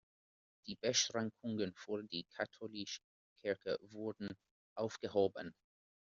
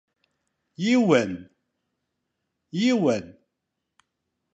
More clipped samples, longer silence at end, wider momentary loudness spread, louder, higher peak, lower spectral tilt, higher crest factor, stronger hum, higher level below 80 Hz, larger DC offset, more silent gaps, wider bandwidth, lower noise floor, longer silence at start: neither; second, 0.5 s vs 1.25 s; about the same, 15 LU vs 14 LU; second, -41 LUFS vs -23 LUFS; second, -20 dBFS vs -6 dBFS; second, -3 dB/octave vs -5.5 dB/octave; about the same, 22 dB vs 22 dB; neither; second, -80 dBFS vs -66 dBFS; neither; first, 3.04-3.36 s, 4.51-4.76 s vs none; second, 7.4 kHz vs 8.2 kHz; first, under -90 dBFS vs -81 dBFS; second, 0.65 s vs 0.8 s